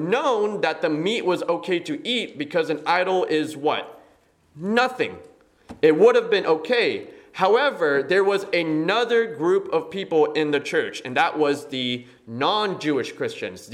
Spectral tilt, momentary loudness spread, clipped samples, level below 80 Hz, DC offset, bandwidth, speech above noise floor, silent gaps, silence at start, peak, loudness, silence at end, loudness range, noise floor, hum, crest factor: -5 dB/octave; 8 LU; under 0.1%; -70 dBFS; under 0.1%; 13 kHz; 36 dB; none; 0 s; -4 dBFS; -22 LUFS; 0 s; 4 LU; -58 dBFS; none; 18 dB